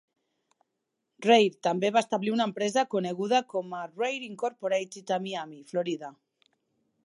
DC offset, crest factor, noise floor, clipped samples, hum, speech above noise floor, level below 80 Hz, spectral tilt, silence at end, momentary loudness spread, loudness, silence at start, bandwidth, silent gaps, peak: under 0.1%; 22 dB; -82 dBFS; under 0.1%; none; 55 dB; -84 dBFS; -4.5 dB/octave; 0.95 s; 12 LU; -28 LUFS; 1.2 s; 11.5 kHz; none; -8 dBFS